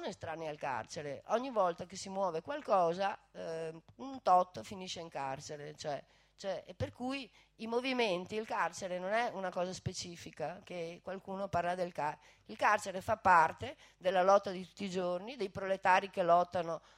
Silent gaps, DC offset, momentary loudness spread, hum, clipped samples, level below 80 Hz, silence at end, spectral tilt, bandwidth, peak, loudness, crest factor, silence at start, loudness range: none; under 0.1%; 14 LU; none; under 0.1%; -70 dBFS; 0.2 s; -4.5 dB/octave; 15 kHz; -14 dBFS; -35 LUFS; 22 dB; 0 s; 7 LU